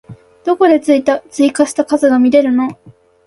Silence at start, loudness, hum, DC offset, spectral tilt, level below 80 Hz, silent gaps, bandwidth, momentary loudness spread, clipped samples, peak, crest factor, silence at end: 0.1 s; -13 LUFS; none; under 0.1%; -4.5 dB/octave; -56 dBFS; none; 11.5 kHz; 8 LU; under 0.1%; 0 dBFS; 12 dB; 0.35 s